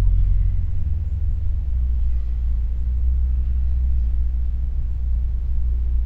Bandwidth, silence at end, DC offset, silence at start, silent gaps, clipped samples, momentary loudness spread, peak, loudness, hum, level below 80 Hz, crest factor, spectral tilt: 1.3 kHz; 0 s; 1%; 0 s; none; under 0.1%; 3 LU; -6 dBFS; -24 LUFS; none; -20 dBFS; 12 dB; -10 dB/octave